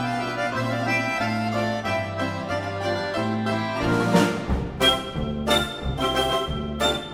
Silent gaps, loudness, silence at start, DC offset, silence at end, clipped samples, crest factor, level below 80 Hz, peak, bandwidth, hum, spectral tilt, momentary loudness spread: none; -24 LUFS; 0 s; under 0.1%; 0 s; under 0.1%; 18 dB; -38 dBFS; -6 dBFS; 16 kHz; none; -5 dB/octave; 7 LU